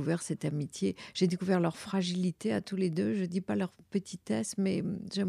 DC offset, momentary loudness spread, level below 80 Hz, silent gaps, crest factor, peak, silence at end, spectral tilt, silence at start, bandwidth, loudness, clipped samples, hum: under 0.1%; 5 LU; -72 dBFS; none; 16 dB; -16 dBFS; 0 s; -6 dB/octave; 0 s; 13 kHz; -33 LUFS; under 0.1%; none